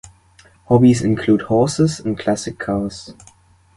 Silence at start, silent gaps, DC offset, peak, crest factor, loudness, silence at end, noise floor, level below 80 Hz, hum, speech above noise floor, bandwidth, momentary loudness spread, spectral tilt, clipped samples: 0.05 s; none; under 0.1%; -2 dBFS; 16 dB; -17 LUFS; 0.65 s; -51 dBFS; -46 dBFS; none; 34 dB; 11.5 kHz; 10 LU; -6.5 dB/octave; under 0.1%